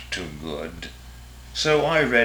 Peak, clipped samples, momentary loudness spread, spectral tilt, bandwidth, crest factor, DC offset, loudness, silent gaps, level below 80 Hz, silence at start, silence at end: -4 dBFS; under 0.1%; 24 LU; -4 dB/octave; over 20 kHz; 20 dB; under 0.1%; -23 LUFS; none; -44 dBFS; 0 s; 0 s